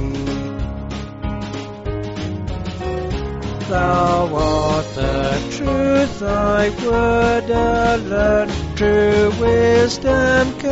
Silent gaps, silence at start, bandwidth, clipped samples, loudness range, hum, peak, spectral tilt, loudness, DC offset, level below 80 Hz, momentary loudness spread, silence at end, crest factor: none; 0 s; 8 kHz; under 0.1%; 9 LU; none; -2 dBFS; -5 dB/octave; -18 LUFS; under 0.1%; -30 dBFS; 12 LU; 0 s; 16 dB